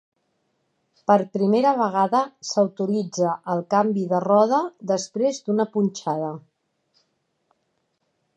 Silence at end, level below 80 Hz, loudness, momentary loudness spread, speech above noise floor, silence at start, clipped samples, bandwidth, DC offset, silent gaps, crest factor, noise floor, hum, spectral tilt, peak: 2 s; -76 dBFS; -22 LUFS; 8 LU; 51 dB; 1.1 s; under 0.1%; 9.4 kHz; under 0.1%; none; 20 dB; -73 dBFS; none; -6 dB/octave; -4 dBFS